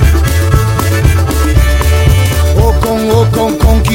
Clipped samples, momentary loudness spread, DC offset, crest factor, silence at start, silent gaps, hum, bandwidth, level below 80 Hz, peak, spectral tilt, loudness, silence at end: 0.5%; 2 LU; under 0.1%; 8 dB; 0 s; none; none; 17 kHz; -12 dBFS; 0 dBFS; -6 dB/octave; -10 LUFS; 0 s